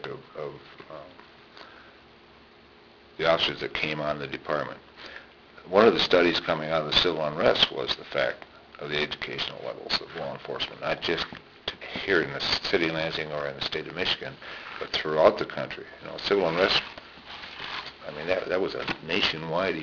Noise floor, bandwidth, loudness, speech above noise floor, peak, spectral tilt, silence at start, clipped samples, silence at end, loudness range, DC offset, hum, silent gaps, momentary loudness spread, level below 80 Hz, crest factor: -53 dBFS; 5.4 kHz; -26 LUFS; 26 dB; -6 dBFS; -4.5 dB/octave; 0 s; under 0.1%; 0 s; 7 LU; under 0.1%; none; none; 19 LU; -56 dBFS; 22 dB